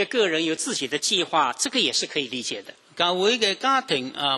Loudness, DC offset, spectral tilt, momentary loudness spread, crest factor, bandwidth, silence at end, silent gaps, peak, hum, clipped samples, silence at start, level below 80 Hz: -23 LUFS; under 0.1%; -1.5 dB/octave; 8 LU; 18 dB; 13 kHz; 0 s; none; -6 dBFS; none; under 0.1%; 0 s; -72 dBFS